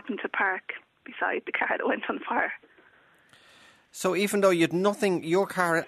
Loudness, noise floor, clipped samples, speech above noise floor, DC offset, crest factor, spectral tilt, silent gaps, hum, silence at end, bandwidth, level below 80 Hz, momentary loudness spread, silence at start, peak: -27 LUFS; -60 dBFS; under 0.1%; 33 dB; under 0.1%; 20 dB; -4.5 dB/octave; none; none; 0 s; 13.5 kHz; -74 dBFS; 14 LU; 0.05 s; -8 dBFS